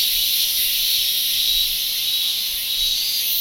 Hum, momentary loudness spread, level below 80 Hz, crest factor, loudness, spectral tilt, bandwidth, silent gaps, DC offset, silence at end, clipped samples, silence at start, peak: none; 3 LU; -46 dBFS; 16 dB; -17 LUFS; 3 dB/octave; 16.5 kHz; none; under 0.1%; 0 s; under 0.1%; 0 s; -4 dBFS